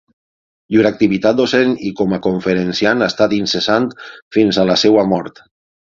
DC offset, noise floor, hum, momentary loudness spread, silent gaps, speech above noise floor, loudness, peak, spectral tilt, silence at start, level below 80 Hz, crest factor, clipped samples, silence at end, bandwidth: under 0.1%; under -90 dBFS; none; 7 LU; 4.22-4.31 s; over 76 dB; -15 LUFS; 0 dBFS; -5.5 dB/octave; 0.7 s; -50 dBFS; 16 dB; under 0.1%; 0.55 s; 7.6 kHz